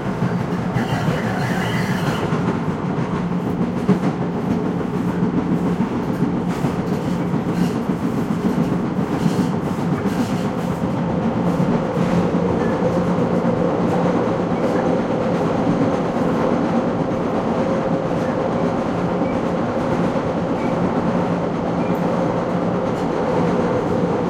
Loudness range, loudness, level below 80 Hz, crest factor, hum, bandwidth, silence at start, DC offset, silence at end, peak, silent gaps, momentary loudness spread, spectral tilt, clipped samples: 2 LU; -20 LUFS; -44 dBFS; 16 dB; none; 15 kHz; 0 s; under 0.1%; 0 s; -4 dBFS; none; 3 LU; -7.5 dB/octave; under 0.1%